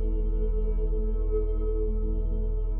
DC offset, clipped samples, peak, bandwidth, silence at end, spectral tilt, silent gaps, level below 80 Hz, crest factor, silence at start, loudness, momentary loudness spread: under 0.1%; under 0.1%; -16 dBFS; 1.4 kHz; 0 s; -13.5 dB/octave; none; -26 dBFS; 8 dB; 0 s; -31 LUFS; 2 LU